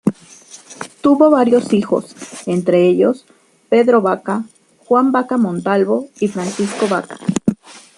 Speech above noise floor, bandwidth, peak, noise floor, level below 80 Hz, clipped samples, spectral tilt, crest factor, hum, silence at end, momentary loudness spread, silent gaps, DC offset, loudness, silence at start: 27 dB; 11.5 kHz; -2 dBFS; -41 dBFS; -58 dBFS; under 0.1%; -6.5 dB/octave; 14 dB; none; 0.2 s; 15 LU; none; under 0.1%; -16 LUFS; 0.05 s